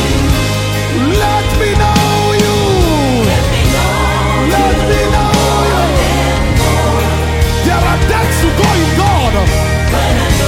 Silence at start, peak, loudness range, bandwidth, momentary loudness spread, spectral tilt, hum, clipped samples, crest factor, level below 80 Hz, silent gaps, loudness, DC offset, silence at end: 0 s; 0 dBFS; 0 LU; 16.5 kHz; 2 LU; -5 dB/octave; none; under 0.1%; 10 dB; -18 dBFS; none; -11 LUFS; under 0.1%; 0 s